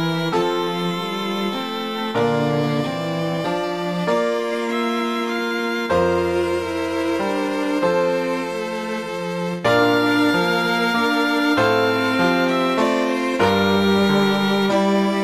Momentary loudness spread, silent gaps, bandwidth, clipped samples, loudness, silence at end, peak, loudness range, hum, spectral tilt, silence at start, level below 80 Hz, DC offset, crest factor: 7 LU; none; 15.5 kHz; under 0.1%; -20 LUFS; 0 s; -4 dBFS; 4 LU; none; -5.5 dB/octave; 0 s; -54 dBFS; under 0.1%; 14 dB